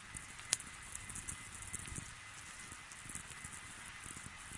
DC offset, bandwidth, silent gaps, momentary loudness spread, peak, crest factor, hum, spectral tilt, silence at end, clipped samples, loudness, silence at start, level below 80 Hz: under 0.1%; 11.5 kHz; none; 11 LU; -10 dBFS; 38 dB; none; -1 dB/octave; 0 s; under 0.1%; -45 LUFS; 0 s; -62 dBFS